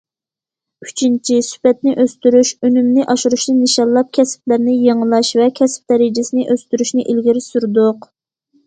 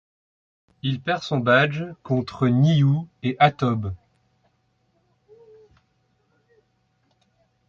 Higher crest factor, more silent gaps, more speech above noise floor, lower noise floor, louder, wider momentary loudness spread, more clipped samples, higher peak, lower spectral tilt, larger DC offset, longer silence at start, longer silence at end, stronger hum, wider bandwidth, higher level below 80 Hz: second, 14 dB vs 20 dB; neither; first, 75 dB vs 47 dB; first, -89 dBFS vs -68 dBFS; first, -14 LUFS vs -22 LUFS; second, 5 LU vs 12 LU; neither; first, 0 dBFS vs -4 dBFS; second, -4 dB/octave vs -7.5 dB/octave; neither; about the same, 0.8 s vs 0.85 s; second, 0.65 s vs 3.75 s; neither; first, 9.4 kHz vs 7.2 kHz; second, -62 dBFS vs -54 dBFS